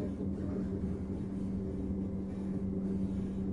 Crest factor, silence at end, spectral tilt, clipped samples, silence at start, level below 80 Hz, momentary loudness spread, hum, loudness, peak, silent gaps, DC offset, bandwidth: 12 dB; 0 s; -10 dB/octave; under 0.1%; 0 s; -48 dBFS; 3 LU; none; -37 LUFS; -24 dBFS; none; under 0.1%; 7 kHz